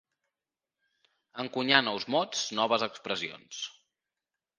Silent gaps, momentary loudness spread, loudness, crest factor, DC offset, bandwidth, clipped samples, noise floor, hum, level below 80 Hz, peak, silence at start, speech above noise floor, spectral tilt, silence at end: none; 15 LU; -29 LUFS; 30 dB; under 0.1%; 10 kHz; under 0.1%; under -90 dBFS; none; -78 dBFS; -4 dBFS; 1.35 s; over 60 dB; -2.5 dB/octave; 0.9 s